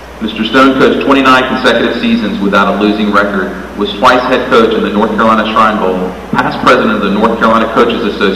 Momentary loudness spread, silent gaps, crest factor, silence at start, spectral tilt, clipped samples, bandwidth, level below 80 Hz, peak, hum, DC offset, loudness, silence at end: 7 LU; none; 10 dB; 0 s; -5.5 dB/octave; 1%; 14 kHz; -34 dBFS; 0 dBFS; none; 0.6%; -9 LUFS; 0 s